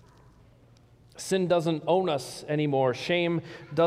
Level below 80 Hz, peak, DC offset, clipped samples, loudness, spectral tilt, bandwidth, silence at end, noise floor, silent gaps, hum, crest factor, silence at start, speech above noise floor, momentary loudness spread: -66 dBFS; -12 dBFS; under 0.1%; under 0.1%; -27 LUFS; -5.5 dB/octave; 15.5 kHz; 0 s; -57 dBFS; none; none; 16 dB; 1.15 s; 31 dB; 8 LU